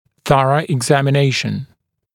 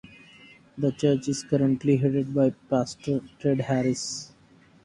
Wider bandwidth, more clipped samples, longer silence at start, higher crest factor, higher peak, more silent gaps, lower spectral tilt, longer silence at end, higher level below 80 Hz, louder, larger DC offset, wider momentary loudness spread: first, 15 kHz vs 11.5 kHz; neither; second, 0.25 s vs 0.75 s; about the same, 16 dB vs 16 dB; first, 0 dBFS vs -10 dBFS; neither; about the same, -5.5 dB/octave vs -6.5 dB/octave; about the same, 0.5 s vs 0.6 s; first, -52 dBFS vs -60 dBFS; first, -16 LUFS vs -26 LUFS; neither; about the same, 8 LU vs 8 LU